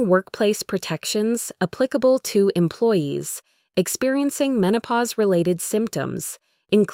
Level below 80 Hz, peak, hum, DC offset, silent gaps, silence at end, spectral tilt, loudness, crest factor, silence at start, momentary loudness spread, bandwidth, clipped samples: -62 dBFS; -6 dBFS; none; under 0.1%; none; 0 s; -5 dB/octave; -22 LUFS; 16 dB; 0 s; 8 LU; 16.5 kHz; under 0.1%